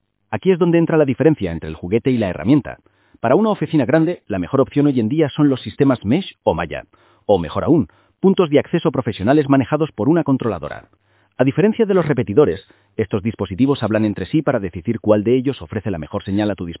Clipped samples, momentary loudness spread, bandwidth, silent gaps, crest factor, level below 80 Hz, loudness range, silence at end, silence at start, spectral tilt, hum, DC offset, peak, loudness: under 0.1%; 10 LU; 4 kHz; none; 18 dB; -44 dBFS; 2 LU; 0.05 s; 0.3 s; -12 dB/octave; none; under 0.1%; 0 dBFS; -18 LUFS